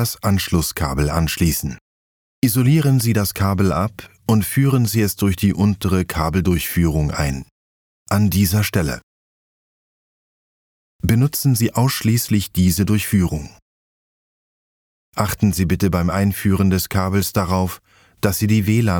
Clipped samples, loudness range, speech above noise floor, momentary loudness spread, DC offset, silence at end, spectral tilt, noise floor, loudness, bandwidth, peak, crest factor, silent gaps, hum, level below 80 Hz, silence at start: under 0.1%; 4 LU; over 73 dB; 7 LU; under 0.1%; 0 s; -5.5 dB/octave; under -90 dBFS; -18 LUFS; over 20 kHz; 0 dBFS; 18 dB; 1.81-2.42 s, 7.51-8.06 s, 9.03-10.99 s, 13.62-15.12 s; none; -36 dBFS; 0 s